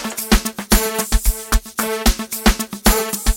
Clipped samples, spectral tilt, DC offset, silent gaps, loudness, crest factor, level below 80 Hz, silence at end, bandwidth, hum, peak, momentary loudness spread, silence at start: under 0.1%; -3.5 dB/octave; under 0.1%; none; -18 LUFS; 18 dB; -20 dBFS; 0 s; 17 kHz; none; 0 dBFS; 4 LU; 0 s